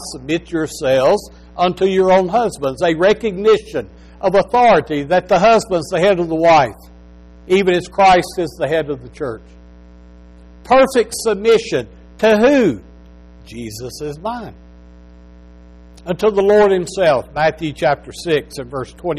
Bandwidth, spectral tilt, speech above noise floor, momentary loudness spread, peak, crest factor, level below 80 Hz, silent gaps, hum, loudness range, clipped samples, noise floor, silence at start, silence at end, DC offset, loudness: 14 kHz; -5 dB/octave; 26 dB; 15 LU; -4 dBFS; 12 dB; -42 dBFS; none; 60 Hz at -40 dBFS; 5 LU; under 0.1%; -41 dBFS; 0 s; 0 s; under 0.1%; -15 LUFS